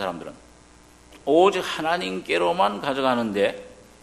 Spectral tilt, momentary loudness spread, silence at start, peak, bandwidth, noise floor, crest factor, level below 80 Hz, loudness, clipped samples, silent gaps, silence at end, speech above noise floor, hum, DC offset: -4.5 dB/octave; 16 LU; 0 s; -4 dBFS; 13 kHz; -51 dBFS; 20 dB; -58 dBFS; -23 LUFS; under 0.1%; none; 0.3 s; 29 dB; 60 Hz at -55 dBFS; under 0.1%